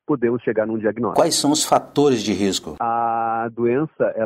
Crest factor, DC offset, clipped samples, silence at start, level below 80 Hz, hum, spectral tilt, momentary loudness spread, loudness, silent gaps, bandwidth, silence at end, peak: 16 dB; under 0.1%; under 0.1%; 0.1 s; -56 dBFS; none; -4 dB/octave; 5 LU; -20 LUFS; none; 16 kHz; 0 s; -4 dBFS